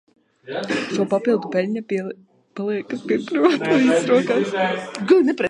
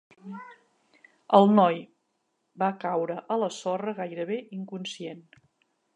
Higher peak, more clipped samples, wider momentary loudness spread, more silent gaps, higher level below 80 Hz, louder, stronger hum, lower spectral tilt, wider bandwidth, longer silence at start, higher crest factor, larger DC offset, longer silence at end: about the same, -2 dBFS vs -4 dBFS; neither; second, 13 LU vs 22 LU; neither; first, -72 dBFS vs -82 dBFS; first, -20 LUFS vs -26 LUFS; neither; about the same, -5.5 dB/octave vs -6.5 dB/octave; about the same, 10.5 kHz vs 9.8 kHz; first, 0.45 s vs 0.25 s; second, 18 dB vs 24 dB; neither; second, 0 s vs 0.75 s